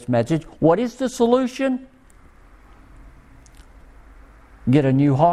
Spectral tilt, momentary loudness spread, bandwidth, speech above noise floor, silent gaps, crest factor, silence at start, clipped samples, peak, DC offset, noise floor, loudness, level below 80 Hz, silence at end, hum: -7.5 dB/octave; 8 LU; 13.5 kHz; 31 dB; none; 18 dB; 0 s; under 0.1%; -4 dBFS; under 0.1%; -49 dBFS; -20 LUFS; -48 dBFS; 0 s; none